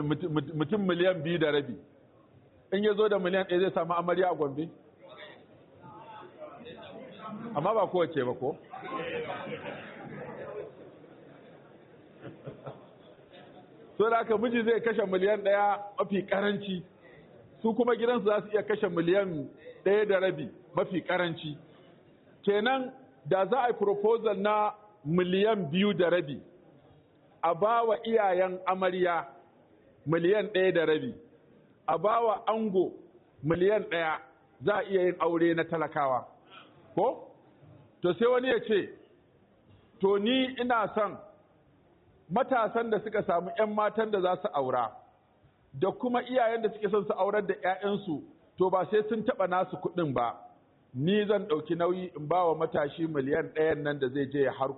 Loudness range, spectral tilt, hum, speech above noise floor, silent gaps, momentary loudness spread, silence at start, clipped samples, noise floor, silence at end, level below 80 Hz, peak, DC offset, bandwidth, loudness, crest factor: 6 LU; -4.5 dB/octave; none; 36 dB; none; 16 LU; 0 s; under 0.1%; -64 dBFS; 0 s; -70 dBFS; -14 dBFS; under 0.1%; 4.2 kHz; -29 LUFS; 16 dB